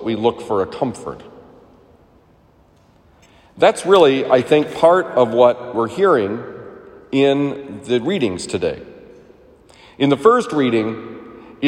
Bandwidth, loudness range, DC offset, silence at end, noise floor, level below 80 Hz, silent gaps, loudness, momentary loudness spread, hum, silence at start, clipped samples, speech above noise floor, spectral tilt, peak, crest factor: 12 kHz; 9 LU; under 0.1%; 0 s; -52 dBFS; -56 dBFS; none; -16 LUFS; 18 LU; none; 0 s; under 0.1%; 36 dB; -5.5 dB/octave; 0 dBFS; 18 dB